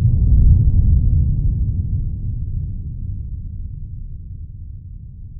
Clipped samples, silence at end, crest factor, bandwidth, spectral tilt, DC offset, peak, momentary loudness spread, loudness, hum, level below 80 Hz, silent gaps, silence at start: under 0.1%; 0 s; 16 dB; 0.8 kHz; -17 dB/octave; under 0.1%; -2 dBFS; 20 LU; -19 LUFS; none; -20 dBFS; none; 0 s